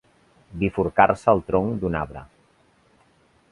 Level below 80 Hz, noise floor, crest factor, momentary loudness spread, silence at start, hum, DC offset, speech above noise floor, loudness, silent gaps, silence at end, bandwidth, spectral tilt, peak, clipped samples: -46 dBFS; -60 dBFS; 24 dB; 17 LU; 0.5 s; none; under 0.1%; 39 dB; -22 LUFS; none; 1.25 s; 11 kHz; -8 dB/octave; 0 dBFS; under 0.1%